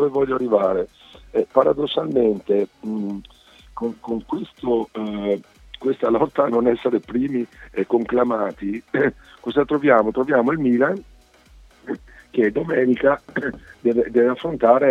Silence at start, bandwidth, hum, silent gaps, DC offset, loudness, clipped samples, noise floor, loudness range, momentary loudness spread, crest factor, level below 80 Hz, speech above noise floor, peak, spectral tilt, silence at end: 0 s; 7.8 kHz; none; none; under 0.1%; -21 LUFS; under 0.1%; -50 dBFS; 4 LU; 11 LU; 20 dB; -50 dBFS; 30 dB; 0 dBFS; -8 dB/octave; 0 s